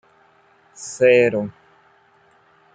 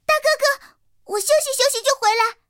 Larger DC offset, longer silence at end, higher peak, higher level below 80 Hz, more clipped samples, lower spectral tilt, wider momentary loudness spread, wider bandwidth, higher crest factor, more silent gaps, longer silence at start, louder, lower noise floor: neither; first, 1.25 s vs 0.15 s; about the same, -2 dBFS vs -4 dBFS; about the same, -66 dBFS vs -64 dBFS; neither; first, -5 dB/octave vs 2 dB/octave; first, 20 LU vs 8 LU; second, 9.2 kHz vs 17 kHz; about the same, 20 dB vs 16 dB; neither; first, 0.8 s vs 0.1 s; about the same, -17 LUFS vs -19 LUFS; first, -56 dBFS vs -51 dBFS